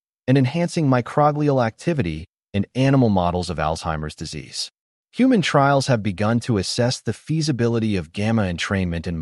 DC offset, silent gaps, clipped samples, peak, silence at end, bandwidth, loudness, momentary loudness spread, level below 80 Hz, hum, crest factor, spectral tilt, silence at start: under 0.1%; 2.29-2.33 s, 4.79-5.04 s; under 0.1%; -4 dBFS; 0 s; 11.5 kHz; -21 LUFS; 11 LU; -44 dBFS; none; 16 dB; -6 dB/octave; 0.3 s